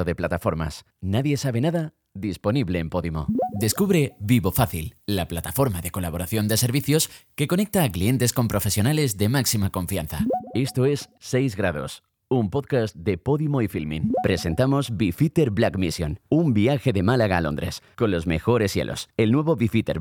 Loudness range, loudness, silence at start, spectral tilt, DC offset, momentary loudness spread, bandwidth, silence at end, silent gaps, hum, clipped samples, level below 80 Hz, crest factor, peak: 3 LU; -23 LUFS; 0 s; -5.5 dB/octave; under 0.1%; 7 LU; 19.5 kHz; 0 s; none; none; under 0.1%; -46 dBFS; 18 dB; -6 dBFS